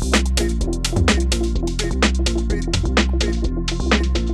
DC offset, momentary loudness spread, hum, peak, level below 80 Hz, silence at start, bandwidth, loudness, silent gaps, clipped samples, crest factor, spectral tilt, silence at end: under 0.1%; 5 LU; none; 0 dBFS; -20 dBFS; 0 s; 13 kHz; -20 LUFS; none; under 0.1%; 18 dB; -4.5 dB/octave; 0 s